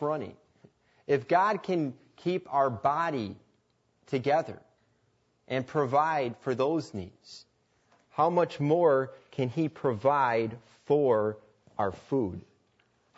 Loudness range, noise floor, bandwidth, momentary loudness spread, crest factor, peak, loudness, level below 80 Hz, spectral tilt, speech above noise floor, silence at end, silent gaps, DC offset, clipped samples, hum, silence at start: 4 LU; -71 dBFS; 8 kHz; 18 LU; 18 dB; -12 dBFS; -29 LUFS; -70 dBFS; -7.5 dB/octave; 43 dB; 0.8 s; none; under 0.1%; under 0.1%; none; 0 s